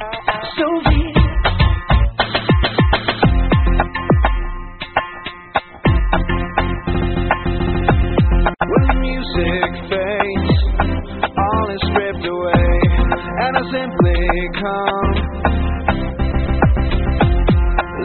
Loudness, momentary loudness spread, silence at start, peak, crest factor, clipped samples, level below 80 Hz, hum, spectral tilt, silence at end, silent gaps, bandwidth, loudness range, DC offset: -17 LUFS; 6 LU; 0 s; 0 dBFS; 16 dB; under 0.1%; -20 dBFS; none; -5 dB/octave; 0 s; none; 4.5 kHz; 3 LU; under 0.1%